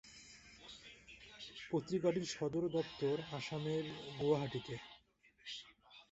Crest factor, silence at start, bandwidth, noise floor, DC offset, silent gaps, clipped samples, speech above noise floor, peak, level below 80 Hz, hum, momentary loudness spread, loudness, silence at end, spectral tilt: 20 dB; 0.05 s; 8 kHz; -70 dBFS; under 0.1%; none; under 0.1%; 31 dB; -22 dBFS; -72 dBFS; none; 20 LU; -40 LUFS; 0.1 s; -5 dB/octave